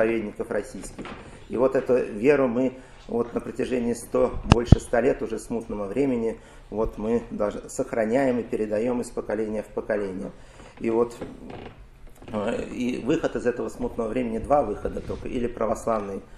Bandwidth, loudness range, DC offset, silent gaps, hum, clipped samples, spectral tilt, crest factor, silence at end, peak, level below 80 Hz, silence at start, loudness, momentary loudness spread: 13.5 kHz; 6 LU; under 0.1%; none; none; under 0.1%; -7 dB/octave; 26 dB; 0 s; 0 dBFS; -38 dBFS; 0 s; -26 LUFS; 14 LU